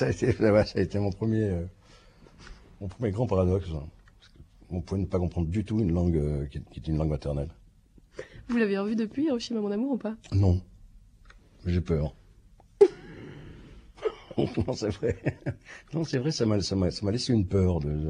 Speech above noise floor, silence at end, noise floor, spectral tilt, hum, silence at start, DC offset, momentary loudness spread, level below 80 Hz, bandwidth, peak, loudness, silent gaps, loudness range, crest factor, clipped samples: 30 dB; 0 s; -57 dBFS; -7 dB/octave; none; 0 s; under 0.1%; 16 LU; -44 dBFS; 10 kHz; -6 dBFS; -28 LUFS; none; 3 LU; 22 dB; under 0.1%